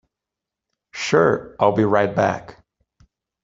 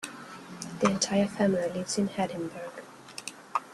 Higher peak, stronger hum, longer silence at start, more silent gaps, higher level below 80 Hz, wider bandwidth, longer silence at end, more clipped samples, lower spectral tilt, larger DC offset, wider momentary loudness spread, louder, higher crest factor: first, -2 dBFS vs -10 dBFS; neither; first, 0.95 s vs 0 s; neither; first, -58 dBFS vs -68 dBFS; second, 7.8 kHz vs 12.5 kHz; first, 0.9 s vs 0 s; neither; first, -6 dB/octave vs -4.5 dB/octave; neither; second, 12 LU vs 17 LU; first, -19 LUFS vs -29 LUFS; about the same, 20 dB vs 20 dB